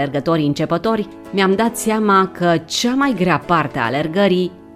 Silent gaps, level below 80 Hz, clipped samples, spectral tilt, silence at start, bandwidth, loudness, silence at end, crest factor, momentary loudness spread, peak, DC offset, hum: none; -50 dBFS; under 0.1%; -5 dB/octave; 0 s; 16 kHz; -17 LUFS; 0.05 s; 16 dB; 5 LU; 0 dBFS; under 0.1%; none